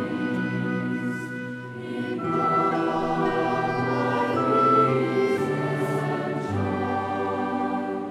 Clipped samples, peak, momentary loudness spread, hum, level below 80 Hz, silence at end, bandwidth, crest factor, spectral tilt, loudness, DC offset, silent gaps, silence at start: under 0.1%; -8 dBFS; 10 LU; none; -58 dBFS; 0 s; 13.5 kHz; 16 dB; -7.5 dB/octave; -25 LUFS; under 0.1%; none; 0 s